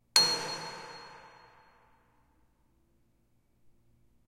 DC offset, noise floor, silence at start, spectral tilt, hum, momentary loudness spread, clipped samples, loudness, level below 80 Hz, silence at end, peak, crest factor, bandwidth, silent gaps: under 0.1%; -70 dBFS; 0.15 s; 0 dB/octave; none; 24 LU; under 0.1%; -28 LUFS; -72 dBFS; 3 s; -6 dBFS; 32 dB; 16 kHz; none